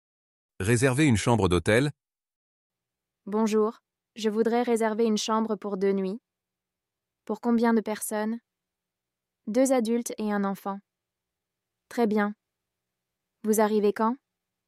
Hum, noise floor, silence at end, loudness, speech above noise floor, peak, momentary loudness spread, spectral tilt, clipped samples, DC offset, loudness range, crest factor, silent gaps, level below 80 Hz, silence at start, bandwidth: none; -88 dBFS; 0.5 s; -26 LUFS; 63 dB; -10 dBFS; 12 LU; -5.5 dB/octave; under 0.1%; under 0.1%; 4 LU; 18 dB; 2.36-2.70 s; -60 dBFS; 0.6 s; 15 kHz